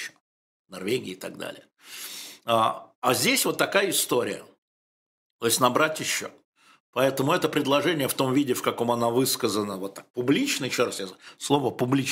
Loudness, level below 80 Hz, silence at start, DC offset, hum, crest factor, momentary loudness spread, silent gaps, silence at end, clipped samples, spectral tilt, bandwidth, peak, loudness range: -25 LUFS; -70 dBFS; 0 s; under 0.1%; none; 22 dB; 15 LU; 0.20-0.65 s, 2.95-3.02 s, 4.58-5.39 s, 6.45-6.53 s, 6.80-6.93 s, 10.10-10.14 s; 0 s; under 0.1%; -3.5 dB/octave; 16 kHz; -4 dBFS; 2 LU